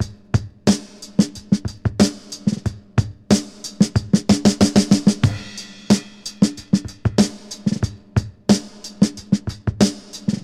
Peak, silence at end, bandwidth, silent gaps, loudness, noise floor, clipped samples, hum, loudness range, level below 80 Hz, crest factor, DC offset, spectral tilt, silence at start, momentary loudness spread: -2 dBFS; 0.05 s; 13.5 kHz; none; -20 LUFS; -36 dBFS; under 0.1%; none; 3 LU; -40 dBFS; 18 dB; under 0.1%; -5.5 dB/octave; 0 s; 10 LU